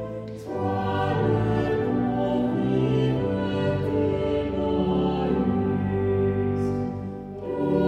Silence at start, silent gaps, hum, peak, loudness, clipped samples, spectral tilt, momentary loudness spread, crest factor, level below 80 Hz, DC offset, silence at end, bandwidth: 0 s; none; none; -10 dBFS; -25 LUFS; under 0.1%; -9 dB/octave; 7 LU; 14 dB; -44 dBFS; under 0.1%; 0 s; 8.8 kHz